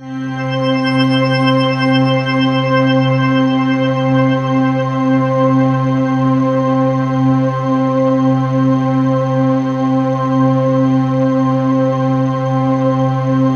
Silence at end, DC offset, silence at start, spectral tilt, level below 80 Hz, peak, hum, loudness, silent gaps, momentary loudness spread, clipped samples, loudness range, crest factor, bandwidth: 0 s; under 0.1%; 0 s; -8 dB/octave; -50 dBFS; 0 dBFS; none; -14 LUFS; none; 3 LU; under 0.1%; 1 LU; 12 dB; 6.6 kHz